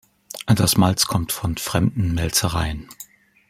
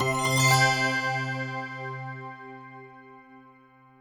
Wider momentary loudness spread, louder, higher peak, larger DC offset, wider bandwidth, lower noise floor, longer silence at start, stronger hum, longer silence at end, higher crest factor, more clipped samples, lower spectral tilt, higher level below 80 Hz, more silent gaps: second, 20 LU vs 24 LU; first, -20 LUFS vs -25 LUFS; first, -2 dBFS vs -10 dBFS; neither; second, 16.5 kHz vs over 20 kHz; second, -45 dBFS vs -56 dBFS; first, 0.35 s vs 0 s; neither; second, 0.45 s vs 0.6 s; about the same, 20 dB vs 20 dB; neither; about the same, -4.5 dB/octave vs -3.5 dB/octave; first, -40 dBFS vs -62 dBFS; neither